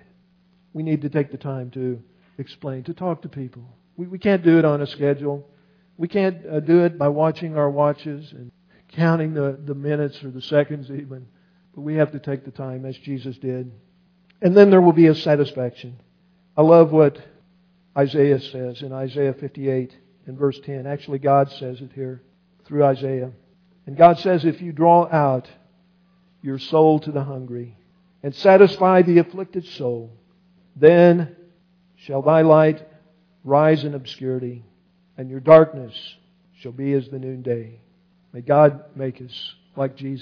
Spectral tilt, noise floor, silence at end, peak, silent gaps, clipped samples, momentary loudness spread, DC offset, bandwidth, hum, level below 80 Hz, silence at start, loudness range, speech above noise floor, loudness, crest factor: -9.5 dB/octave; -59 dBFS; 0 s; 0 dBFS; none; under 0.1%; 21 LU; under 0.1%; 5.4 kHz; none; -66 dBFS; 0.75 s; 8 LU; 40 dB; -19 LUFS; 20 dB